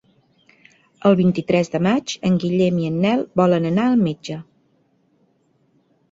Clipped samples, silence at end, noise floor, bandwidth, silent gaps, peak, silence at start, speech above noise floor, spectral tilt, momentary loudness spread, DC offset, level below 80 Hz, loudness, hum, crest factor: under 0.1%; 1.7 s; -62 dBFS; 7.8 kHz; none; -2 dBFS; 1.05 s; 44 dB; -7 dB/octave; 5 LU; under 0.1%; -56 dBFS; -19 LUFS; none; 18 dB